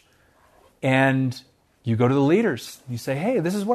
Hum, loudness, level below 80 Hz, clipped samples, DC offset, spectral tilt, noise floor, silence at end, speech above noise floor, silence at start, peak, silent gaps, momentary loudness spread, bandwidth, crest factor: none; -22 LUFS; -66 dBFS; under 0.1%; under 0.1%; -7 dB/octave; -59 dBFS; 0 s; 37 dB; 0.85 s; -6 dBFS; none; 14 LU; 13.5 kHz; 18 dB